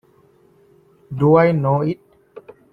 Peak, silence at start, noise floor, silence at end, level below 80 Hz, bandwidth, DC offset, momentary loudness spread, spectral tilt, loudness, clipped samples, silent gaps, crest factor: -2 dBFS; 1.1 s; -54 dBFS; 0.35 s; -56 dBFS; 4.9 kHz; under 0.1%; 18 LU; -10.5 dB/octave; -17 LUFS; under 0.1%; none; 18 dB